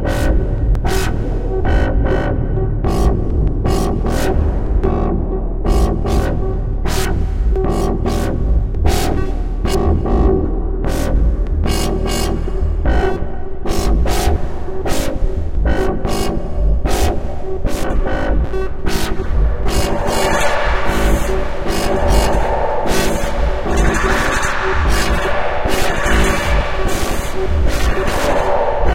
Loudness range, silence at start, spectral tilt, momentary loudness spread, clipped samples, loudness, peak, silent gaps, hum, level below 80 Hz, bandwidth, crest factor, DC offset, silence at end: 3 LU; 0 s; -5.5 dB/octave; 6 LU; under 0.1%; -18 LUFS; 0 dBFS; none; none; -18 dBFS; 16 kHz; 14 dB; 4%; 0 s